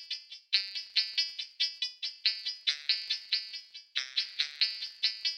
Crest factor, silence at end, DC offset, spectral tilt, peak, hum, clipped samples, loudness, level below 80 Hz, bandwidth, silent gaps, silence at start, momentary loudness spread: 24 dB; 0 s; under 0.1%; 5 dB/octave; -10 dBFS; none; under 0.1%; -31 LUFS; under -90 dBFS; 16.5 kHz; none; 0 s; 7 LU